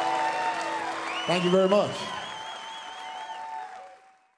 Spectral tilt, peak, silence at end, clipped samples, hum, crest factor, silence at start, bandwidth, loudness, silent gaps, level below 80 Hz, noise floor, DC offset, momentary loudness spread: -4.5 dB/octave; -8 dBFS; 0.4 s; under 0.1%; none; 20 dB; 0 s; 11 kHz; -28 LUFS; none; -72 dBFS; -54 dBFS; under 0.1%; 16 LU